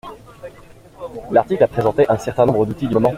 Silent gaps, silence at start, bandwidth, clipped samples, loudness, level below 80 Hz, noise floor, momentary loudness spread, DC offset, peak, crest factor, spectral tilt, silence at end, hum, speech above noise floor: none; 0.05 s; 15 kHz; under 0.1%; -17 LUFS; -46 dBFS; -43 dBFS; 22 LU; under 0.1%; -2 dBFS; 18 dB; -7.5 dB/octave; 0 s; none; 27 dB